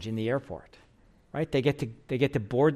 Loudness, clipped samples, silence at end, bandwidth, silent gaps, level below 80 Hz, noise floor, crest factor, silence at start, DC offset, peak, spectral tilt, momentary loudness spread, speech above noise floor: -29 LUFS; under 0.1%; 0 s; 13 kHz; none; -56 dBFS; -60 dBFS; 18 dB; 0 s; under 0.1%; -12 dBFS; -7.5 dB/octave; 13 LU; 32 dB